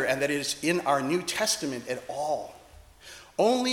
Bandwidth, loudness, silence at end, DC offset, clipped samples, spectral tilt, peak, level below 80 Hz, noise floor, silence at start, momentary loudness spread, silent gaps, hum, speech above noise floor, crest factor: 18 kHz; -28 LUFS; 0 s; under 0.1%; under 0.1%; -3 dB/octave; -10 dBFS; -62 dBFS; -52 dBFS; 0 s; 12 LU; none; none; 24 dB; 18 dB